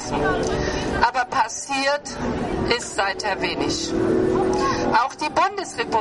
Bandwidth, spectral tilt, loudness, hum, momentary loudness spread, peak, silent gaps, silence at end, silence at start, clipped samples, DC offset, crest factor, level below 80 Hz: 11.5 kHz; -4 dB/octave; -22 LUFS; none; 4 LU; -2 dBFS; none; 0 s; 0 s; under 0.1%; under 0.1%; 20 dB; -40 dBFS